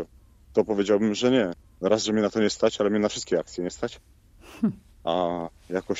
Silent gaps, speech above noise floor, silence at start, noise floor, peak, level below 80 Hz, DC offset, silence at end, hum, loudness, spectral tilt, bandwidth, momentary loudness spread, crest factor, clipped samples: none; 28 dB; 0 s; -53 dBFS; -8 dBFS; -56 dBFS; under 0.1%; 0 s; none; -26 LUFS; -5 dB/octave; 8 kHz; 10 LU; 18 dB; under 0.1%